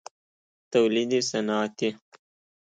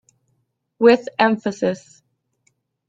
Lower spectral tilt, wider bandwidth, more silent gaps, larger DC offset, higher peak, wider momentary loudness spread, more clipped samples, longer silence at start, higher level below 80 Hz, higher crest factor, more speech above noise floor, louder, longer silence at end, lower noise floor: second, -4 dB/octave vs -5.5 dB/octave; first, 9.4 kHz vs 7.8 kHz; neither; neither; second, -10 dBFS vs -2 dBFS; about the same, 7 LU vs 9 LU; neither; about the same, 0.7 s vs 0.8 s; second, -76 dBFS vs -64 dBFS; about the same, 18 dB vs 20 dB; first, over 65 dB vs 52 dB; second, -26 LUFS vs -18 LUFS; second, 0.65 s vs 1.1 s; first, under -90 dBFS vs -70 dBFS